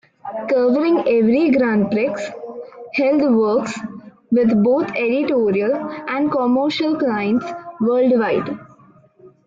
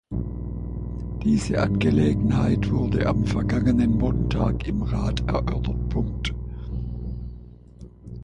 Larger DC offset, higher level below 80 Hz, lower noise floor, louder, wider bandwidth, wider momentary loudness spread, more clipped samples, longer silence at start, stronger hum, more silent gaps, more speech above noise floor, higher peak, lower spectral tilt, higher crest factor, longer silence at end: neither; second, -60 dBFS vs -32 dBFS; first, -50 dBFS vs -44 dBFS; first, -18 LUFS vs -24 LUFS; second, 7.6 kHz vs 10.5 kHz; about the same, 14 LU vs 13 LU; neither; first, 0.25 s vs 0.1 s; second, none vs 60 Hz at -30 dBFS; neither; first, 33 dB vs 23 dB; about the same, -8 dBFS vs -8 dBFS; about the same, -7 dB/octave vs -7.5 dB/octave; about the same, 12 dB vs 16 dB; first, 0.2 s vs 0 s